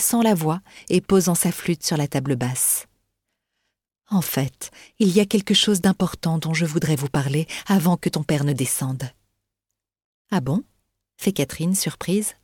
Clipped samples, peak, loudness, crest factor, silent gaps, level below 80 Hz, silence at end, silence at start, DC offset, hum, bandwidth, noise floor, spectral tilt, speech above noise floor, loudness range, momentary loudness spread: under 0.1%; -4 dBFS; -22 LUFS; 18 dB; 10.04-10.25 s; -54 dBFS; 0.15 s; 0 s; under 0.1%; none; 18.5 kHz; -84 dBFS; -4.5 dB/octave; 62 dB; 6 LU; 8 LU